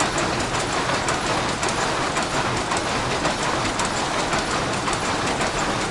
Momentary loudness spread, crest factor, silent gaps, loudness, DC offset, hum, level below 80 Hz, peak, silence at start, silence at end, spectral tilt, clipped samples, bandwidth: 1 LU; 16 dB; none; -22 LUFS; under 0.1%; none; -40 dBFS; -8 dBFS; 0 s; 0 s; -3 dB/octave; under 0.1%; 11.5 kHz